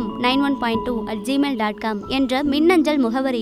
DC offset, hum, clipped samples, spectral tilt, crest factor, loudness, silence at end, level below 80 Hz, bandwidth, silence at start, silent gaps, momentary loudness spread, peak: under 0.1%; none; under 0.1%; -5 dB/octave; 14 dB; -20 LUFS; 0 s; -46 dBFS; 14 kHz; 0 s; none; 7 LU; -6 dBFS